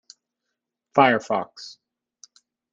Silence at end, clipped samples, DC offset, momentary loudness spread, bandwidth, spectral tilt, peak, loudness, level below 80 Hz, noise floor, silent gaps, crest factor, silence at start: 1.05 s; under 0.1%; under 0.1%; 22 LU; 7.8 kHz; -5 dB/octave; -2 dBFS; -21 LUFS; -70 dBFS; -82 dBFS; none; 24 dB; 0.95 s